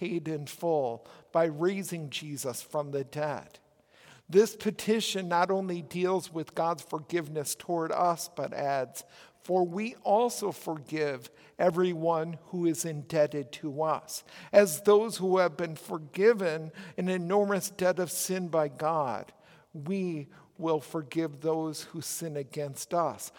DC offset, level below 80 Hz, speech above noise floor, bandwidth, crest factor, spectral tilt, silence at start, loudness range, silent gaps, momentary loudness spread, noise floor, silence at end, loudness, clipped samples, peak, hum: under 0.1%; -78 dBFS; 29 dB; 18 kHz; 22 dB; -5 dB/octave; 0 s; 6 LU; none; 11 LU; -59 dBFS; 0.1 s; -30 LUFS; under 0.1%; -8 dBFS; none